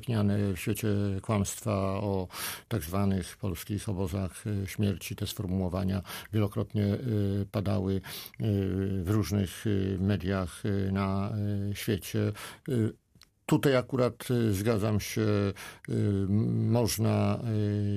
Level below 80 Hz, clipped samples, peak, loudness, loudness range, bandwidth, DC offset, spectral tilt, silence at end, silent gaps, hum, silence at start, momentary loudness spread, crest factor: -54 dBFS; under 0.1%; -12 dBFS; -30 LUFS; 4 LU; 15.5 kHz; under 0.1%; -6.5 dB/octave; 0 s; none; none; 0 s; 7 LU; 16 dB